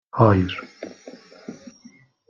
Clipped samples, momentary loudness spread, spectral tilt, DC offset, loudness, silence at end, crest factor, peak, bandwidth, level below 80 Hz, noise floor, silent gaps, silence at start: under 0.1%; 26 LU; -8 dB/octave; under 0.1%; -20 LUFS; 0.8 s; 22 dB; -2 dBFS; 7 kHz; -58 dBFS; -51 dBFS; none; 0.15 s